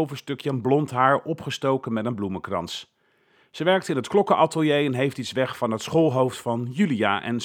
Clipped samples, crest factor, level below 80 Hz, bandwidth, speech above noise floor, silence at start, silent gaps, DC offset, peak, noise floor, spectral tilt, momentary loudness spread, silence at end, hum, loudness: under 0.1%; 20 dB; -66 dBFS; 18 kHz; 39 dB; 0 s; none; under 0.1%; -4 dBFS; -62 dBFS; -6 dB/octave; 9 LU; 0 s; none; -24 LUFS